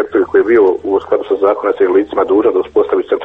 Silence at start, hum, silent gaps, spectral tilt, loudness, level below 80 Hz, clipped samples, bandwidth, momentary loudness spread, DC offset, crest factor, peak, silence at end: 0 s; none; none; -7.5 dB/octave; -13 LUFS; -48 dBFS; under 0.1%; 3.9 kHz; 4 LU; under 0.1%; 12 dB; 0 dBFS; 0 s